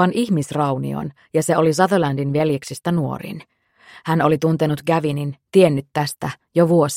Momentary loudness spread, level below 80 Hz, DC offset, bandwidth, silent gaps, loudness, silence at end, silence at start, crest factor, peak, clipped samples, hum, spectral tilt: 11 LU; -56 dBFS; under 0.1%; 16 kHz; none; -19 LUFS; 0 s; 0 s; 18 dB; -2 dBFS; under 0.1%; none; -6.5 dB/octave